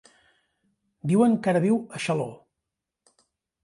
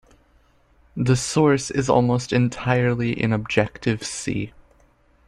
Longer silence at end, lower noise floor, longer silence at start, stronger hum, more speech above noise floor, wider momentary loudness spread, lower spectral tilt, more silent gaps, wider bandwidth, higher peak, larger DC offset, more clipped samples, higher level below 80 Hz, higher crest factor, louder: first, 1.3 s vs 0.8 s; first, -85 dBFS vs -58 dBFS; about the same, 1.05 s vs 0.95 s; neither; first, 62 dB vs 37 dB; first, 11 LU vs 8 LU; first, -7 dB/octave vs -5.5 dB/octave; neither; about the same, 11.5 kHz vs 12 kHz; second, -10 dBFS vs -2 dBFS; neither; neither; second, -70 dBFS vs -48 dBFS; about the same, 16 dB vs 20 dB; second, -24 LUFS vs -21 LUFS